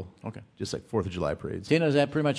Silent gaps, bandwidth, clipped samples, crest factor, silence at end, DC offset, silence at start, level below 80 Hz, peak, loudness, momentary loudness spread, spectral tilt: none; 11 kHz; under 0.1%; 18 dB; 0 s; under 0.1%; 0 s; -54 dBFS; -10 dBFS; -28 LUFS; 17 LU; -6.5 dB/octave